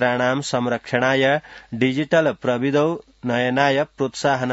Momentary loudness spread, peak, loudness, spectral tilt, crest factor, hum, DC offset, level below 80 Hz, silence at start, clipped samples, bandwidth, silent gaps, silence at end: 6 LU; -2 dBFS; -20 LUFS; -5.5 dB/octave; 18 dB; none; under 0.1%; -60 dBFS; 0 s; under 0.1%; 8 kHz; none; 0 s